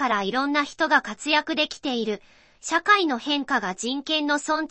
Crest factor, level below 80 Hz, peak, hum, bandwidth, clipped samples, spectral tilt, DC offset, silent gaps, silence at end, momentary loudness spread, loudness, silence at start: 20 dB; -64 dBFS; -4 dBFS; none; 8.8 kHz; under 0.1%; -2.5 dB/octave; under 0.1%; none; 0.05 s; 8 LU; -23 LUFS; 0 s